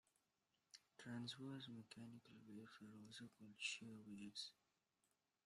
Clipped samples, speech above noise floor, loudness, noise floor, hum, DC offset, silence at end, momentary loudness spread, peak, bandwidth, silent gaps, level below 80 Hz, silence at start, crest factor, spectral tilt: under 0.1%; 33 dB; -55 LUFS; -89 dBFS; none; under 0.1%; 0.9 s; 13 LU; -36 dBFS; 13.5 kHz; none; under -90 dBFS; 0.75 s; 22 dB; -3.5 dB/octave